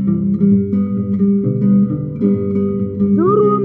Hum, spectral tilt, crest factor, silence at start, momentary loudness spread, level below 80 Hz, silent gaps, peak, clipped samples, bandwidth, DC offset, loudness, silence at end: none; -13.5 dB/octave; 12 dB; 0 s; 5 LU; -48 dBFS; none; -2 dBFS; under 0.1%; 2.4 kHz; under 0.1%; -15 LUFS; 0 s